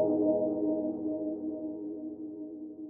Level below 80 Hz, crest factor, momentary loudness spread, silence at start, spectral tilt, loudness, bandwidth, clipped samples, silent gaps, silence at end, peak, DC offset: -70 dBFS; 16 dB; 14 LU; 0 s; -11 dB/octave; -33 LUFS; 1.3 kHz; under 0.1%; none; 0 s; -16 dBFS; under 0.1%